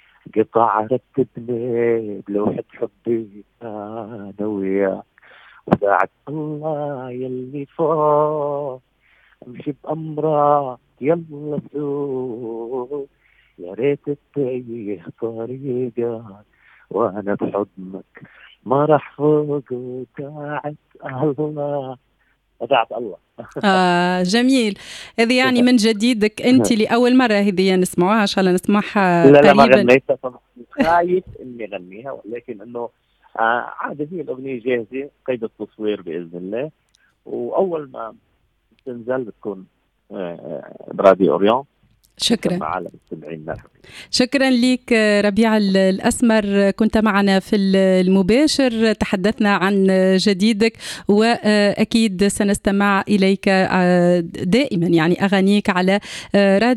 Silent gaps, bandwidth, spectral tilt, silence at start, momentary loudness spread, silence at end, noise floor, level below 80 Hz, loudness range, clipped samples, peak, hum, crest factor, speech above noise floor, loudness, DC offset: none; 13.5 kHz; -5.5 dB/octave; 0.35 s; 17 LU; 0 s; -63 dBFS; -50 dBFS; 11 LU; under 0.1%; 0 dBFS; none; 18 dB; 45 dB; -18 LUFS; under 0.1%